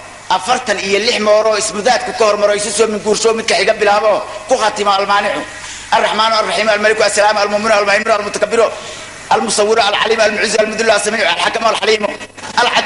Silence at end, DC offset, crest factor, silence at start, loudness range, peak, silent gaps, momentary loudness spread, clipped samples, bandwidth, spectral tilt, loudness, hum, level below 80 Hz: 0 s; under 0.1%; 14 dB; 0 s; 1 LU; 0 dBFS; none; 6 LU; under 0.1%; 11.5 kHz; -2 dB/octave; -13 LUFS; none; -50 dBFS